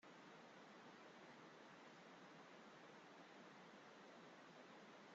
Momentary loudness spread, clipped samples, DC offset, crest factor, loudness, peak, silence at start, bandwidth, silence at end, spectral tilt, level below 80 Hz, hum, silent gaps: 0 LU; under 0.1%; under 0.1%; 14 dB; -63 LUFS; -50 dBFS; 0 s; 7.6 kHz; 0 s; -2.5 dB/octave; under -90 dBFS; none; none